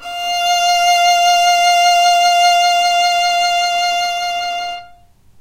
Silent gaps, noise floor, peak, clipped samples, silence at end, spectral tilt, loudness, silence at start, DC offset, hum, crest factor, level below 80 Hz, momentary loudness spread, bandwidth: none; -45 dBFS; -2 dBFS; under 0.1%; 0.55 s; 2 dB/octave; -13 LUFS; 0 s; under 0.1%; none; 12 dB; -54 dBFS; 9 LU; 16 kHz